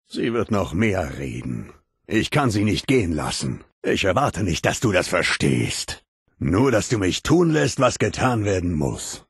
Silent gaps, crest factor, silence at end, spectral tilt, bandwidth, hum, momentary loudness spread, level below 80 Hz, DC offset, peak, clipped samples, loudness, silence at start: 3.72-3.82 s, 6.08-6.26 s; 18 dB; 0.1 s; -5 dB/octave; 12.5 kHz; none; 10 LU; -42 dBFS; under 0.1%; -4 dBFS; under 0.1%; -21 LUFS; 0.1 s